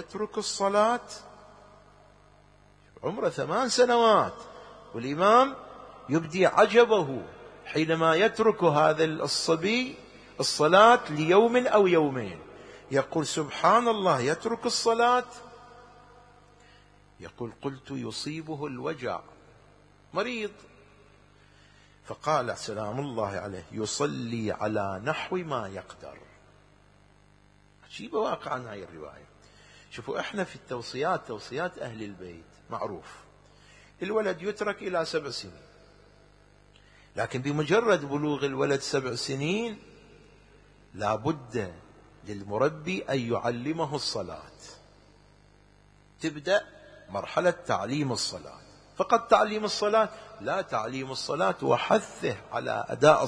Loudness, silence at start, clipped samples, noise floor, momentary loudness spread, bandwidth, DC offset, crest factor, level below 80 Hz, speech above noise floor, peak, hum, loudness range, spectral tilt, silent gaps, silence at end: -27 LUFS; 0 s; under 0.1%; -59 dBFS; 20 LU; 10.5 kHz; under 0.1%; 24 dB; -62 dBFS; 33 dB; -6 dBFS; 50 Hz at -60 dBFS; 14 LU; -4.5 dB/octave; none; 0 s